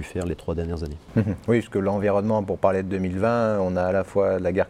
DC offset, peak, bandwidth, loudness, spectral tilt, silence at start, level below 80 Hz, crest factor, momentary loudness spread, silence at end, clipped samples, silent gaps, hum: under 0.1%; -6 dBFS; 12.5 kHz; -24 LUFS; -8 dB/octave; 0 s; -44 dBFS; 16 dB; 7 LU; 0 s; under 0.1%; none; none